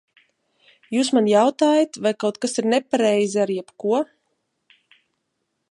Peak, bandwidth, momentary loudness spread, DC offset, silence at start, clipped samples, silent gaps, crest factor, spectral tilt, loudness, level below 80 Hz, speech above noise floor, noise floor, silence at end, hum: -4 dBFS; 11.5 kHz; 8 LU; under 0.1%; 0.9 s; under 0.1%; none; 18 dB; -4.5 dB/octave; -20 LUFS; -76 dBFS; 56 dB; -75 dBFS; 1.65 s; none